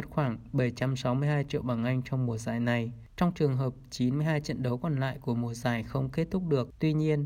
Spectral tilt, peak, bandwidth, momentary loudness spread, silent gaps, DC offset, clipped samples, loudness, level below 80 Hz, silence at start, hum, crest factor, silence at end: -7.5 dB/octave; -14 dBFS; 15.5 kHz; 4 LU; none; under 0.1%; under 0.1%; -30 LUFS; -54 dBFS; 0 s; none; 16 dB; 0 s